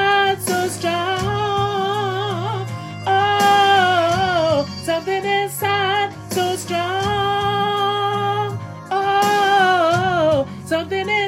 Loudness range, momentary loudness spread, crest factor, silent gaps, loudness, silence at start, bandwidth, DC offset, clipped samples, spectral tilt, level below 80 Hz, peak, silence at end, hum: 3 LU; 9 LU; 14 dB; none; -18 LUFS; 0 s; 16 kHz; under 0.1%; under 0.1%; -4 dB/octave; -52 dBFS; -4 dBFS; 0 s; none